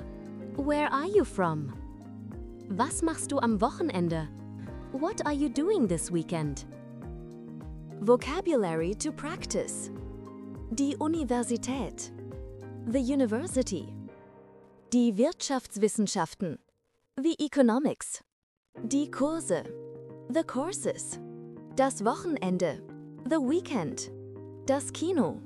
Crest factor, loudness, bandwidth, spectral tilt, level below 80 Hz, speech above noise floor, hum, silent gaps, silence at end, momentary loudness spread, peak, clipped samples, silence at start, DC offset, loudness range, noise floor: 22 dB; -30 LUFS; 13 kHz; -5 dB/octave; -50 dBFS; 45 dB; none; 18.32-18.63 s, 18.69-18.73 s; 0 s; 17 LU; -10 dBFS; under 0.1%; 0 s; under 0.1%; 3 LU; -74 dBFS